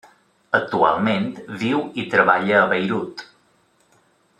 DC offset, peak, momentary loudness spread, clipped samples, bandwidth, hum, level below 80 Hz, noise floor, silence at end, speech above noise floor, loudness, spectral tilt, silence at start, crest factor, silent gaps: under 0.1%; -2 dBFS; 11 LU; under 0.1%; 11 kHz; none; -64 dBFS; -61 dBFS; 1.15 s; 41 dB; -19 LUFS; -6.5 dB/octave; 0.55 s; 20 dB; none